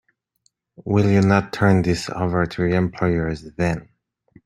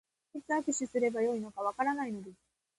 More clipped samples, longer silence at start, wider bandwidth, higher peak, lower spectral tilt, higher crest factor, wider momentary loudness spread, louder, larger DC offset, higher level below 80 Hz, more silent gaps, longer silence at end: neither; first, 0.8 s vs 0.35 s; about the same, 11.5 kHz vs 11.5 kHz; first, -2 dBFS vs -18 dBFS; first, -7 dB/octave vs -4 dB/octave; about the same, 18 dB vs 16 dB; second, 8 LU vs 16 LU; first, -20 LUFS vs -33 LUFS; neither; first, -46 dBFS vs -76 dBFS; neither; first, 0.6 s vs 0.45 s